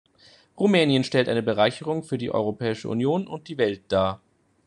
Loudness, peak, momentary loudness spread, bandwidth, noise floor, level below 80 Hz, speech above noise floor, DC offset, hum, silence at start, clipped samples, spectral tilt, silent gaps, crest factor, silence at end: -24 LUFS; -4 dBFS; 8 LU; 11 kHz; -56 dBFS; -64 dBFS; 32 dB; under 0.1%; none; 0.55 s; under 0.1%; -6 dB/octave; none; 20 dB; 0.5 s